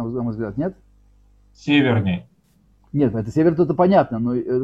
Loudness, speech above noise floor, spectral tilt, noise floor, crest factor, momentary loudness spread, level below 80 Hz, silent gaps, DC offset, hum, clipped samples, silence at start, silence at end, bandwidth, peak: -20 LUFS; 39 dB; -8.5 dB/octave; -58 dBFS; 18 dB; 12 LU; -50 dBFS; none; under 0.1%; 50 Hz at -45 dBFS; under 0.1%; 0 s; 0 s; 7.8 kHz; -2 dBFS